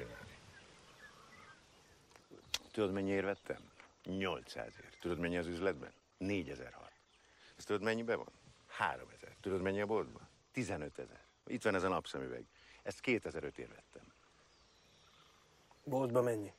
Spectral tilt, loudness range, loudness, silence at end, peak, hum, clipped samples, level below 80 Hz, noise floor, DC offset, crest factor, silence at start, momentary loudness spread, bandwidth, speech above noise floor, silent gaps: -5.5 dB/octave; 4 LU; -40 LUFS; 0.05 s; -20 dBFS; none; under 0.1%; -68 dBFS; -68 dBFS; under 0.1%; 22 dB; 0 s; 22 LU; 15 kHz; 29 dB; none